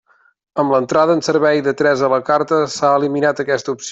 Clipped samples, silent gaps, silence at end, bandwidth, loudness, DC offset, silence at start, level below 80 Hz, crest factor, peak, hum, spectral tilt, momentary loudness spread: under 0.1%; none; 0 s; 8.2 kHz; -16 LUFS; under 0.1%; 0.55 s; -60 dBFS; 14 dB; -2 dBFS; none; -5 dB/octave; 5 LU